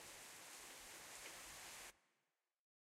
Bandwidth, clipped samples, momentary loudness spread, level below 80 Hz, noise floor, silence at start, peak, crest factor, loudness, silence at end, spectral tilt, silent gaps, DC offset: 16 kHz; under 0.1%; 2 LU; -82 dBFS; under -90 dBFS; 0 s; -38 dBFS; 20 dB; -55 LUFS; 0.9 s; 0 dB/octave; none; under 0.1%